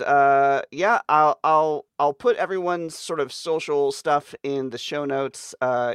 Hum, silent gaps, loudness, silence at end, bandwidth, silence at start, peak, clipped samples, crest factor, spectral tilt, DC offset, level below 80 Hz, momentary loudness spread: none; none; -22 LUFS; 0 s; 13 kHz; 0 s; -6 dBFS; under 0.1%; 16 dB; -4.5 dB/octave; under 0.1%; -72 dBFS; 10 LU